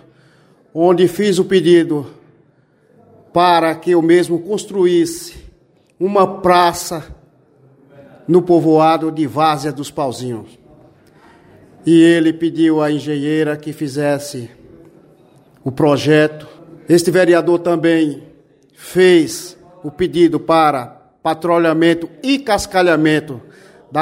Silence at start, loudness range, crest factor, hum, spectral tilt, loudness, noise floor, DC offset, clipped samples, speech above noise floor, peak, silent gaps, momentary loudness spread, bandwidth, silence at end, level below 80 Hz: 0.75 s; 4 LU; 14 dB; none; -5.5 dB/octave; -14 LUFS; -54 dBFS; under 0.1%; under 0.1%; 40 dB; 0 dBFS; none; 16 LU; 16 kHz; 0 s; -52 dBFS